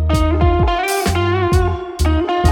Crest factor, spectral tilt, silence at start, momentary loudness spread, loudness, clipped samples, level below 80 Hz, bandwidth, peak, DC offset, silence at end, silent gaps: 12 dB; -6 dB/octave; 0 s; 3 LU; -16 LUFS; under 0.1%; -20 dBFS; 17.5 kHz; -2 dBFS; under 0.1%; 0 s; none